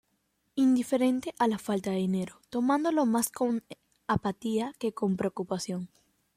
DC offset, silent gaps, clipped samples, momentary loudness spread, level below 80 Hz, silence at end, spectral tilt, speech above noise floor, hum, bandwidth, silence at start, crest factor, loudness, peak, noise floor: under 0.1%; none; under 0.1%; 10 LU; -64 dBFS; 0.5 s; -5.5 dB/octave; 47 dB; none; 16 kHz; 0.55 s; 16 dB; -29 LUFS; -14 dBFS; -75 dBFS